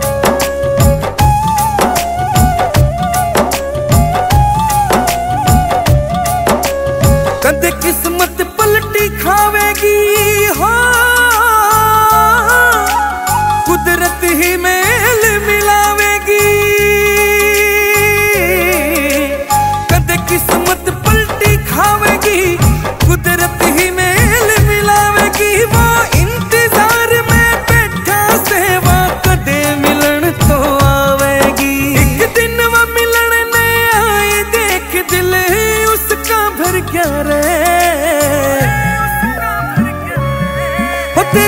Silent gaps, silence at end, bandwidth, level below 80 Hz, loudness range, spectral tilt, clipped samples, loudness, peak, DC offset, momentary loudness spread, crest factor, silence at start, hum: none; 0 s; 16.5 kHz; -22 dBFS; 3 LU; -4 dB/octave; under 0.1%; -10 LUFS; 0 dBFS; under 0.1%; 5 LU; 10 dB; 0 s; none